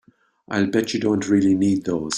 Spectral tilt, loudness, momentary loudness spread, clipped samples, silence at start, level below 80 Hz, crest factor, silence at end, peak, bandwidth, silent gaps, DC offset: -5.5 dB/octave; -20 LUFS; 5 LU; under 0.1%; 0.5 s; -56 dBFS; 14 dB; 0 s; -6 dBFS; 14.5 kHz; none; under 0.1%